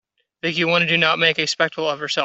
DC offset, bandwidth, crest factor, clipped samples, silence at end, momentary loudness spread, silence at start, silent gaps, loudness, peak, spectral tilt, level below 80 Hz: under 0.1%; 8.2 kHz; 20 dB; under 0.1%; 0 s; 9 LU; 0.45 s; none; -18 LUFS; 0 dBFS; -3.5 dB/octave; -64 dBFS